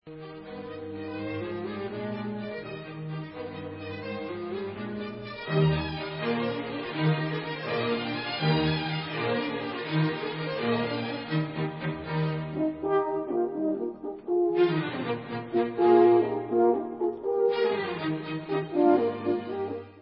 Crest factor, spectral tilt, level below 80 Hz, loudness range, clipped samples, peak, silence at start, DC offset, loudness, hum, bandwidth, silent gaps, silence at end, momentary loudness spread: 20 dB; -11 dB/octave; -56 dBFS; 11 LU; under 0.1%; -8 dBFS; 0.05 s; under 0.1%; -29 LUFS; none; 5.6 kHz; none; 0 s; 13 LU